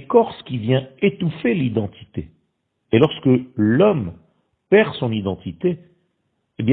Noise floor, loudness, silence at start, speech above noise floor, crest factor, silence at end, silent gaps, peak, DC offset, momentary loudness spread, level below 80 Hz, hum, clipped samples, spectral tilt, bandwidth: -71 dBFS; -19 LUFS; 0 s; 52 dB; 20 dB; 0 s; none; 0 dBFS; under 0.1%; 13 LU; -52 dBFS; none; under 0.1%; -10.5 dB/octave; 4.5 kHz